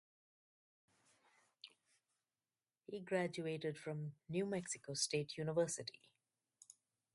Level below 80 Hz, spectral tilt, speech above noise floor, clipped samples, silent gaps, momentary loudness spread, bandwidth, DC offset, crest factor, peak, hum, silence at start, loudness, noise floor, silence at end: -82 dBFS; -4 dB/octave; over 48 dB; under 0.1%; none; 21 LU; 11.5 kHz; under 0.1%; 22 dB; -24 dBFS; none; 1.65 s; -43 LUFS; under -90 dBFS; 1.25 s